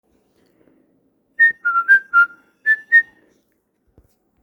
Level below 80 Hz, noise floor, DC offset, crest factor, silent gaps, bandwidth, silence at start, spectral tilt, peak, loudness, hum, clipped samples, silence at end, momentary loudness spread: -70 dBFS; -66 dBFS; under 0.1%; 16 dB; none; 19.5 kHz; 1.4 s; -1.5 dB/octave; -4 dBFS; -15 LUFS; none; under 0.1%; 1.4 s; 11 LU